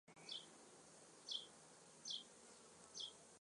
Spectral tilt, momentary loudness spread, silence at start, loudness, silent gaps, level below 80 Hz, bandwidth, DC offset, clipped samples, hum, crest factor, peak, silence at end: -0.5 dB/octave; 14 LU; 0.05 s; -54 LUFS; none; under -90 dBFS; 11 kHz; under 0.1%; under 0.1%; none; 22 dB; -36 dBFS; 0.05 s